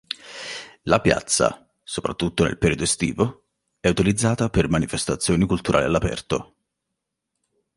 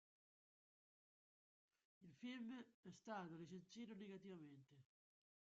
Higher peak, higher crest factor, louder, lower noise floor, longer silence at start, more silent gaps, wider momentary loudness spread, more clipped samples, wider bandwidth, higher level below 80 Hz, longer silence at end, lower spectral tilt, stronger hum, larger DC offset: first, -2 dBFS vs -42 dBFS; about the same, 22 dB vs 20 dB; first, -22 LUFS vs -57 LUFS; second, -81 dBFS vs under -90 dBFS; second, 0.1 s vs 2 s; second, none vs 2.74-2.83 s; first, 12 LU vs 9 LU; neither; first, 11.5 kHz vs 7.4 kHz; first, -40 dBFS vs under -90 dBFS; first, 1.3 s vs 0.75 s; about the same, -4.5 dB/octave vs -5 dB/octave; neither; neither